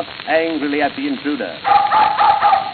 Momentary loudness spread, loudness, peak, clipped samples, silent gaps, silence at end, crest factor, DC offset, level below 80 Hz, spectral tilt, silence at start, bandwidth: 9 LU; -16 LUFS; 0 dBFS; under 0.1%; none; 0 s; 16 dB; under 0.1%; -54 dBFS; -8 dB/octave; 0 s; 4.7 kHz